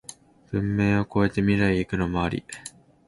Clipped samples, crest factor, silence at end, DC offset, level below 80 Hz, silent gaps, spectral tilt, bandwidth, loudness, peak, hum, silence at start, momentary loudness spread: under 0.1%; 18 dB; 0.4 s; under 0.1%; -44 dBFS; none; -7 dB/octave; 11.5 kHz; -24 LUFS; -8 dBFS; none; 0.1 s; 17 LU